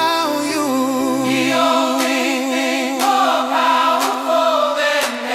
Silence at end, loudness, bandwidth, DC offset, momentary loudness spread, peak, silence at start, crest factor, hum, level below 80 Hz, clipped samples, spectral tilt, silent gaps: 0 s; -16 LUFS; 16 kHz; under 0.1%; 4 LU; -4 dBFS; 0 s; 14 dB; none; -68 dBFS; under 0.1%; -2.5 dB/octave; none